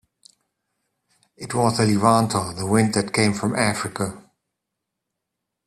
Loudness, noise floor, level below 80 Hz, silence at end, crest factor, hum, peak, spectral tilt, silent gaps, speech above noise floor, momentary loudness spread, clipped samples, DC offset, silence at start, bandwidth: -21 LUFS; -82 dBFS; -56 dBFS; 1.45 s; 22 dB; none; -2 dBFS; -5 dB/octave; none; 61 dB; 11 LU; under 0.1%; under 0.1%; 1.4 s; 13.5 kHz